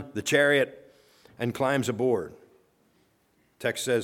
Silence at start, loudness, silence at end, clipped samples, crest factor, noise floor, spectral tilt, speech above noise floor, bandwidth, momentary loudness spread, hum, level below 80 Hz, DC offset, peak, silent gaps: 0 s; -26 LUFS; 0 s; under 0.1%; 20 dB; -67 dBFS; -4.5 dB/octave; 42 dB; 18 kHz; 11 LU; none; -68 dBFS; under 0.1%; -8 dBFS; none